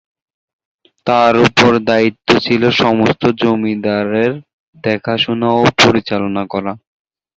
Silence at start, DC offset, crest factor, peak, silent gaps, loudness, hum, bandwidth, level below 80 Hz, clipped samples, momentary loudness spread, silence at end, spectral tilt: 1.05 s; under 0.1%; 14 dB; 0 dBFS; 4.53-4.73 s; -13 LUFS; none; 8 kHz; -48 dBFS; under 0.1%; 11 LU; 0.6 s; -5 dB/octave